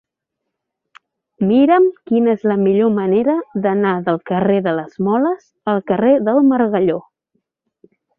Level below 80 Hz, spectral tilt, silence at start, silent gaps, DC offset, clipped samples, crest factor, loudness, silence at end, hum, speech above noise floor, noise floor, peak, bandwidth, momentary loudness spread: -60 dBFS; -10 dB/octave; 1.4 s; none; under 0.1%; under 0.1%; 14 dB; -16 LUFS; 1.2 s; none; 64 dB; -79 dBFS; -2 dBFS; 4.3 kHz; 8 LU